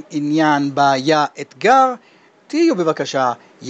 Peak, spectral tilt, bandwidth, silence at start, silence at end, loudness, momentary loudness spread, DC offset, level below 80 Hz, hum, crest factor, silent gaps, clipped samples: -2 dBFS; -5 dB/octave; 8.4 kHz; 0.1 s; 0 s; -16 LUFS; 8 LU; under 0.1%; -70 dBFS; none; 16 dB; none; under 0.1%